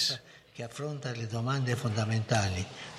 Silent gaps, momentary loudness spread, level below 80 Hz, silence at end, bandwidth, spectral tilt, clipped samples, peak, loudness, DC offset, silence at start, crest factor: none; 12 LU; -60 dBFS; 0 s; 14 kHz; -4.5 dB/octave; under 0.1%; -14 dBFS; -32 LUFS; under 0.1%; 0 s; 18 dB